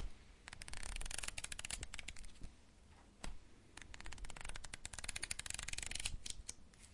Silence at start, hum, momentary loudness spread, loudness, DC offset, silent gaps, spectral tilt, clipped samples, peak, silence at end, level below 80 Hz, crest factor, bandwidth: 0 s; none; 17 LU; -47 LUFS; under 0.1%; none; -1 dB/octave; under 0.1%; -20 dBFS; 0 s; -54 dBFS; 28 dB; 11.5 kHz